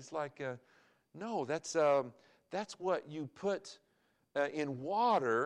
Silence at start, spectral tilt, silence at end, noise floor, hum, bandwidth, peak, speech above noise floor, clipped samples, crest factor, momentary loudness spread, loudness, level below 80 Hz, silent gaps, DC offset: 0 s; -5 dB/octave; 0 s; -76 dBFS; none; 11 kHz; -20 dBFS; 41 dB; under 0.1%; 16 dB; 14 LU; -36 LUFS; -86 dBFS; none; under 0.1%